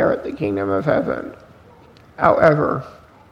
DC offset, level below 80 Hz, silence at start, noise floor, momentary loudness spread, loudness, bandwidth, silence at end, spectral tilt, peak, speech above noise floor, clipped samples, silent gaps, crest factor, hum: under 0.1%; -50 dBFS; 0 s; -47 dBFS; 14 LU; -19 LUFS; 7.6 kHz; 0.35 s; -8.5 dB/octave; 0 dBFS; 28 dB; under 0.1%; none; 20 dB; none